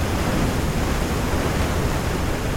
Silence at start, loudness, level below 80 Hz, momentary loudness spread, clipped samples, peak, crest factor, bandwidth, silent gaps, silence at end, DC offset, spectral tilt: 0 s; -23 LUFS; -26 dBFS; 2 LU; under 0.1%; -8 dBFS; 12 dB; 17 kHz; none; 0 s; under 0.1%; -5.5 dB/octave